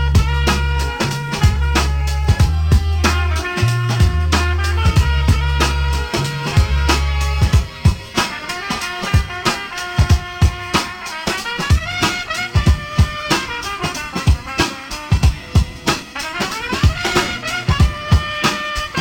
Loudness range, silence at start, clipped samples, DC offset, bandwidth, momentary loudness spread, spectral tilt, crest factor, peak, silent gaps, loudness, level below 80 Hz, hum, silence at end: 2 LU; 0 s; under 0.1%; under 0.1%; 17.5 kHz; 6 LU; -4.5 dB/octave; 14 dB; -2 dBFS; none; -17 LUFS; -22 dBFS; none; 0 s